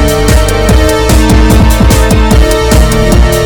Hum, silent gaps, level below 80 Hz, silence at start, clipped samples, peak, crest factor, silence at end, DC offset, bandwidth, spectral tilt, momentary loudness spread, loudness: none; none; -8 dBFS; 0 s; 5%; 0 dBFS; 6 dB; 0 s; 2%; 20 kHz; -5.5 dB/octave; 2 LU; -7 LUFS